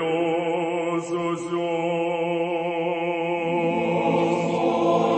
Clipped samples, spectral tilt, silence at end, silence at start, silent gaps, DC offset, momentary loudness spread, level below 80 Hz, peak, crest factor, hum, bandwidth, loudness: under 0.1%; -6.5 dB/octave; 0 s; 0 s; none; under 0.1%; 4 LU; -68 dBFS; -8 dBFS; 16 dB; none; 8.8 kHz; -24 LUFS